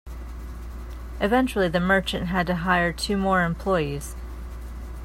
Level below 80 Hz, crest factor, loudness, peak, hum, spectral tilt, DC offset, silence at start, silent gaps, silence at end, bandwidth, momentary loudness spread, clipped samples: -36 dBFS; 18 dB; -23 LUFS; -6 dBFS; none; -5.5 dB/octave; under 0.1%; 0.05 s; none; 0 s; 16 kHz; 17 LU; under 0.1%